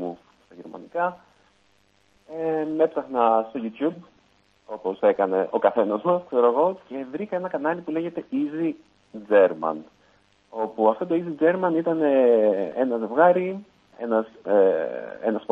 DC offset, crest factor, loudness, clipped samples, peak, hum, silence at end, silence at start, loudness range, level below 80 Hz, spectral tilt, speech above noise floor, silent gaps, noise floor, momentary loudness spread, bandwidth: under 0.1%; 18 dB; -23 LUFS; under 0.1%; -4 dBFS; 50 Hz at -65 dBFS; 0.1 s; 0 s; 5 LU; -72 dBFS; -8.5 dB/octave; 40 dB; none; -63 dBFS; 15 LU; 4.5 kHz